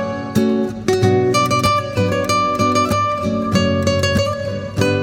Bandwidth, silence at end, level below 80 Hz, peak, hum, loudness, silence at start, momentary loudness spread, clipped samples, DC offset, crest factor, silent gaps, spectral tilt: 17.5 kHz; 0 s; -42 dBFS; -2 dBFS; none; -17 LUFS; 0 s; 5 LU; under 0.1%; under 0.1%; 16 dB; none; -5.5 dB/octave